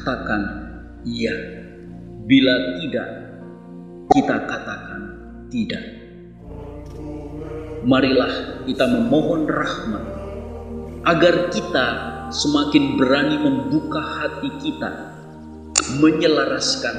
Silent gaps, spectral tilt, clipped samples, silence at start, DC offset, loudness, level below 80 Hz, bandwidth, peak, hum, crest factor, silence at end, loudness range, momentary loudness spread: none; -4.5 dB/octave; under 0.1%; 0 s; 0.1%; -20 LUFS; -44 dBFS; 10.5 kHz; 0 dBFS; none; 22 dB; 0 s; 6 LU; 21 LU